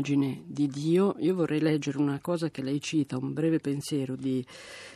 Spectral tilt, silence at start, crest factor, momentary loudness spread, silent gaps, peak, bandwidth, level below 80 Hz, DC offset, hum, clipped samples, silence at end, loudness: -6.5 dB/octave; 0 s; 14 dB; 6 LU; none; -14 dBFS; 13.5 kHz; -70 dBFS; under 0.1%; none; under 0.1%; 0 s; -29 LUFS